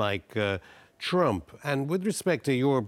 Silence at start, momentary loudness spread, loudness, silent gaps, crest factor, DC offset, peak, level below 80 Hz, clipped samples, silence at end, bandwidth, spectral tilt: 0 s; 7 LU; -28 LUFS; none; 16 dB; under 0.1%; -12 dBFS; -62 dBFS; under 0.1%; 0 s; 16 kHz; -5.5 dB/octave